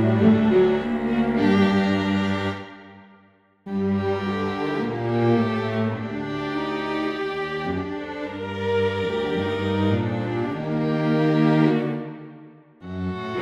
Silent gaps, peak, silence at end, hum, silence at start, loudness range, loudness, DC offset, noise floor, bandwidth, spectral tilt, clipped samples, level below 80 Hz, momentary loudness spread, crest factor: none; -6 dBFS; 0 s; none; 0 s; 4 LU; -23 LUFS; under 0.1%; -57 dBFS; 9 kHz; -8 dB/octave; under 0.1%; -54 dBFS; 12 LU; 16 dB